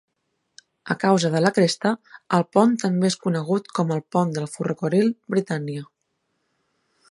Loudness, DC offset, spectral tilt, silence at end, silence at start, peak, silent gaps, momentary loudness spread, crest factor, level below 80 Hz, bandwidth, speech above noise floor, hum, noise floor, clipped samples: -22 LUFS; under 0.1%; -6 dB/octave; 1.25 s; 0.85 s; -2 dBFS; none; 9 LU; 20 dB; -70 dBFS; 11.5 kHz; 53 dB; none; -75 dBFS; under 0.1%